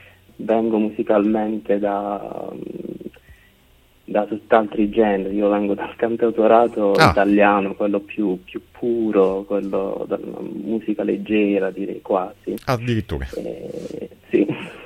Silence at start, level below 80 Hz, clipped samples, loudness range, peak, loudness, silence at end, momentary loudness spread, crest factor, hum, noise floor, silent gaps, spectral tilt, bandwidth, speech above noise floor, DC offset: 0.4 s; -46 dBFS; under 0.1%; 7 LU; 0 dBFS; -20 LUFS; 0 s; 16 LU; 20 dB; none; -54 dBFS; none; -7 dB/octave; 14.5 kHz; 34 dB; under 0.1%